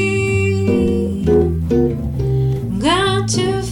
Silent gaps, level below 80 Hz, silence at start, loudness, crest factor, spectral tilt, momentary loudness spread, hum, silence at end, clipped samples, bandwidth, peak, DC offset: none; -30 dBFS; 0 s; -17 LUFS; 10 dB; -6 dB/octave; 4 LU; none; 0 s; under 0.1%; 17 kHz; -6 dBFS; 0.1%